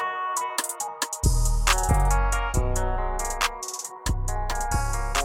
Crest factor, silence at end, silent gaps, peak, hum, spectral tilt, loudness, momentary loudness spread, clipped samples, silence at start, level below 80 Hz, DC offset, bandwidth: 18 dB; 0 s; none; -6 dBFS; none; -3 dB/octave; -26 LUFS; 7 LU; under 0.1%; 0 s; -26 dBFS; under 0.1%; 17 kHz